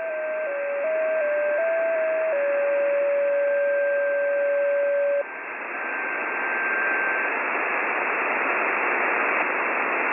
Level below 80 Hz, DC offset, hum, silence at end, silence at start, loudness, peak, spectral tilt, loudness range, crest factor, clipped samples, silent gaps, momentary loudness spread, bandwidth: -78 dBFS; under 0.1%; none; 0 s; 0 s; -23 LUFS; -10 dBFS; -6.5 dB/octave; 2 LU; 14 dB; under 0.1%; none; 5 LU; 3.6 kHz